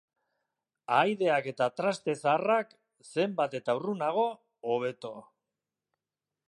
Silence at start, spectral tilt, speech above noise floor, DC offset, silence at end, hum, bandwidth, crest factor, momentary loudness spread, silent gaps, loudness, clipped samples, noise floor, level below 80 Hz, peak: 0.9 s; -5.5 dB/octave; over 61 dB; under 0.1%; 1.25 s; none; 11.5 kHz; 20 dB; 15 LU; none; -30 LUFS; under 0.1%; under -90 dBFS; -84 dBFS; -12 dBFS